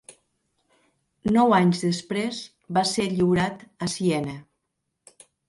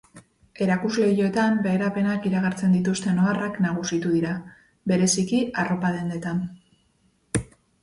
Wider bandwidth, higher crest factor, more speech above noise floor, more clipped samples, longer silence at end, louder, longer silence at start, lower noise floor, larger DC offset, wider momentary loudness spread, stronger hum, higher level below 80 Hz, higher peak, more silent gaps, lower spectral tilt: about the same, 11.5 kHz vs 11.5 kHz; about the same, 20 dB vs 16 dB; first, 56 dB vs 42 dB; neither; first, 1.05 s vs 0.4 s; about the same, -24 LUFS vs -24 LUFS; first, 1.25 s vs 0.15 s; first, -79 dBFS vs -65 dBFS; neither; first, 13 LU vs 8 LU; neither; about the same, -58 dBFS vs -54 dBFS; about the same, -6 dBFS vs -8 dBFS; neither; about the same, -5.5 dB/octave vs -5.5 dB/octave